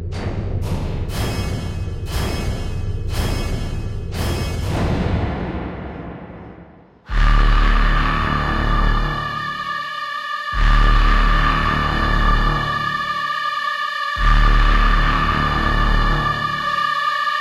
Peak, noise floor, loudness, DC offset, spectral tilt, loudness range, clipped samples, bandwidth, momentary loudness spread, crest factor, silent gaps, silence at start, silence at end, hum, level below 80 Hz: -2 dBFS; -44 dBFS; -20 LUFS; under 0.1%; -5.5 dB/octave; 6 LU; under 0.1%; 13 kHz; 9 LU; 16 dB; none; 0 s; 0 s; none; -20 dBFS